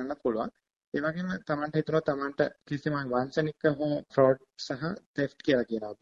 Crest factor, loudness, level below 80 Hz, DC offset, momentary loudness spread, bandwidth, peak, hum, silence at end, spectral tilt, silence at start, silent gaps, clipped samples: 20 dB; -30 LUFS; -64 dBFS; under 0.1%; 9 LU; 7.6 kHz; -10 dBFS; none; 0.05 s; -7 dB/octave; 0 s; 0.76-0.80 s, 0.87-0.92 s, 5.06-5.14 s; under 0.1%